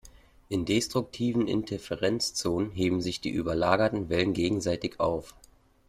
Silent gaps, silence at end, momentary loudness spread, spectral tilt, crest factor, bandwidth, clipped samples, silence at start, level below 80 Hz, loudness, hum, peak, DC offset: none; 0.6 s; 5 LU; -5 dB/octave; 20 dB; 15.5 kHz; under 0.1%; 0.05 s; -54 dBFS; -28 LUFS; none; -8 dBFS; under 0.1%